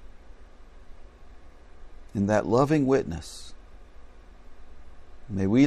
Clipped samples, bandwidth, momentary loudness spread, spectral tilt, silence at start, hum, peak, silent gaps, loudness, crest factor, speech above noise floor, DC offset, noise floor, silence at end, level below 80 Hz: under 0.1%; 12.5 kHz; 20 LU; -7 dB/octave; 0 s; none; -8 dBFS; none; -25 LUFS; 20 dB; 23 dB; under 0.1%; -46 dBFS; 0 s; -48 dBFS